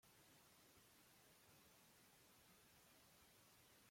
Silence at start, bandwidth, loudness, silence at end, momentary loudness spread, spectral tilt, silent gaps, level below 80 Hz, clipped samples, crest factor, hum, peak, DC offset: 0 s; 16.5 kHz; -70 LUFS; 0 s; 0 LU; -2.5 dB/octave; none; -90 dBFS; under 0.1%; 14 dB; none; -58 dBFS; under 0.1%